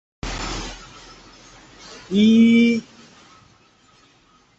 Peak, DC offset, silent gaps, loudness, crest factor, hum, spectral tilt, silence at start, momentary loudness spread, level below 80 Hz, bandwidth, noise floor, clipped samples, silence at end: -6 dBFS; under 0.1%; none; -18 LUFS; 16 dB; none; -5.5 dB/octave; 0.25 s; 27 LU; -42 dBFS; 8 kHz; -56 dBFS; under 0.1%; 1.75 s